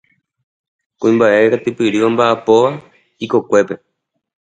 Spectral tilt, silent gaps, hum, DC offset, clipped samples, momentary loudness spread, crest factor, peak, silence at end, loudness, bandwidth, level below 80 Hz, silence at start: -6 dB/octave; none; none; under 0.1%; under 0.1%; 12 LU; 16 dB; 0 dBFS; 0.75 s; -14 LUFS; 9.2 kHz; -62 dBFS; 1 s